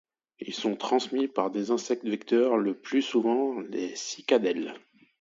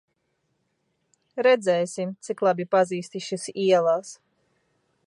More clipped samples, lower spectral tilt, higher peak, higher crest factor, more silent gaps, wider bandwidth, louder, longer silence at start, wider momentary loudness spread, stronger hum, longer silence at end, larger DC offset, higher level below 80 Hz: neither; about the same, -4 dB/octave vs -4.5 dB/octave; about the same, -10 dBFS vs -8 dBFS; about the same, 18 dB vs 18 dB; neither; second, 7.8 kHz vs 11.5 kHz; second, -28 LUFS vs -24 LUFS; second, 0.4 s vs 1.35 s; second, 8 LU vs 12 LU; neither; second, 0.45 s vs 0.9 s; neither; about the same, -80 dBFS vs -80 dBFS